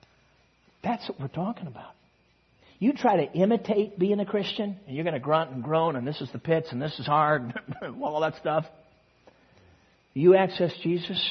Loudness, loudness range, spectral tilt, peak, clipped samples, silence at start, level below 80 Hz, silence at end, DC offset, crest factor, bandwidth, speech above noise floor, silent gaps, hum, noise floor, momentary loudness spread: -27 LUFS; 3 LU; -7.5 dB/octave; -8 dBFS; under 0.1%; 0.85 s; -68 dBFS; 0 s; under 0.1%; 20 dB; 6.2 kHz; 39 dB; none; none; -65 dBFS; 12 LU